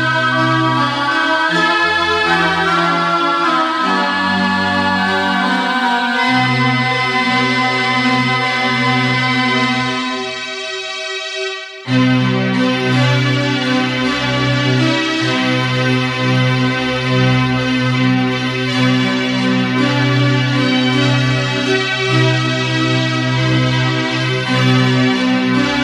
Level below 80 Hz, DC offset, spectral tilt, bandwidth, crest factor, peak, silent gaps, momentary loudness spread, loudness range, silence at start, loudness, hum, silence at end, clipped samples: -48 dBFS; under 0.1%; -5.5 dB/octave; 11.5 kHz; 14 dB; -2 dBFS; none; 3 LU; 2 LU; 0 s; -14 LUFS; none; 0 s; under 0.1%